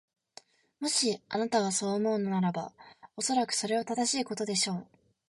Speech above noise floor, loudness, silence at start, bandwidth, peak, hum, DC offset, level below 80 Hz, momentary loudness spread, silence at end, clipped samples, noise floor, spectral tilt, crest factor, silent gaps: 27 dB; -30 LUFS; 0.8 s; 11.5 kHz; -16 dBFS; none; under 0.1%; -76 dBFS; 8 LU; 0.45 s; under 0.1%; -57 dBFS; -3.5 dB/octave; 16 dB; none